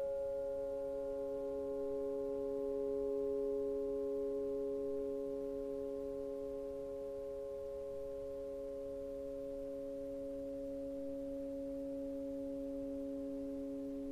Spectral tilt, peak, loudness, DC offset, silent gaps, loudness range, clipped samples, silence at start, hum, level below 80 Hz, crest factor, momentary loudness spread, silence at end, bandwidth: -7.5 dB/octave; -30 dBFS; -42 LUFS; under 0.1%; none; 5 LU; under 0.1%; 0 s; none; -62 dBFS; 12 dB; 6 LU; 0 s; 14 kHz